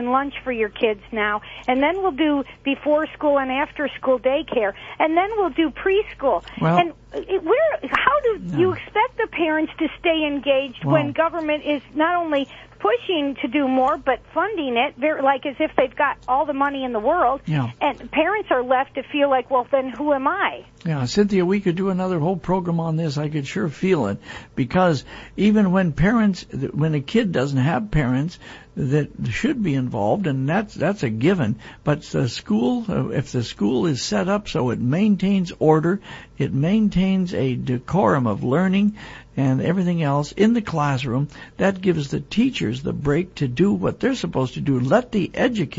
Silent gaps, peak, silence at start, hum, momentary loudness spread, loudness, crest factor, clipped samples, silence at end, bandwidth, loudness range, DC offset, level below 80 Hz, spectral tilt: none; 0 dBFS; 0 s; none; 6 LU; -21 LUFS; 20 dB; under 0.1%; 0 s; 8 kHz; 2 LU; under 0.1%; -46 dBFS; -7 dB/octave